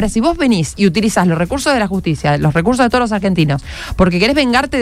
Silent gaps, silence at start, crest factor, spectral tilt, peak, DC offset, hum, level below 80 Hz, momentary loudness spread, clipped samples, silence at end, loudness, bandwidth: none; 0 s; 12 dB; -5.5 dB/octave; 0 dBFS; under 0.1%; none; -30 dBFS; 4 LU; under 0.1%; 0 s; -14 LUFS; 15 kHz